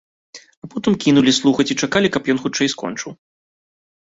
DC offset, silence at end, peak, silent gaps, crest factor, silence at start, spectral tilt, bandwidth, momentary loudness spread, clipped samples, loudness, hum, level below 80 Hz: under 0.1%; 0.9 s; -2 dBFS; 0.57-0.62 s; 18 dB; 0.35 s; -4 dB/octave; 8 kHz; 16 LU; under 0.1%; -17 LUFS; none; -54 dBFS